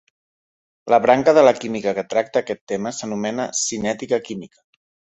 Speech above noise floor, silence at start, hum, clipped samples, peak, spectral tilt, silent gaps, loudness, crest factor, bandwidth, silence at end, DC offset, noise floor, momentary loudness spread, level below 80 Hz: over 71 dB; 0.85 s; none; under 0.1%; -2 dBFS; -4 dB/octave; 2.61-2.67 s; -19 LUFS; 20 dB; 8.4 kHz; 0.7 s; under 0.1%; under -90 dBFS; 12 LU; -60 dBFS